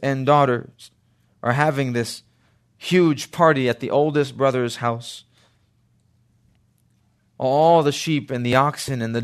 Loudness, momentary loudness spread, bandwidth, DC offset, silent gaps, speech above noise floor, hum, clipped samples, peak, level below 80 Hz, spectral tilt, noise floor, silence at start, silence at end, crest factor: -20 LUFS; 11 LU; 13.5 kHz; under 0.1%; none; 43 dB; none; under 0.1%; -2 dBFS; -62 dBFS; -6 dB/octave; -62 dBFS; 0 s; 0 s; 20 dB